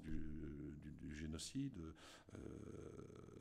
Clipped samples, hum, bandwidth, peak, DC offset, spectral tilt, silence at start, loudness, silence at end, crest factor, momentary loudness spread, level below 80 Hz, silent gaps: under 0.1%; none; 14 kHz; -32 dBFS; under 0.1%; -5.5 dB/octave; 0 s; -53 LUFS; 0 s; 18 dB; 10 LU; -60 dBFS; none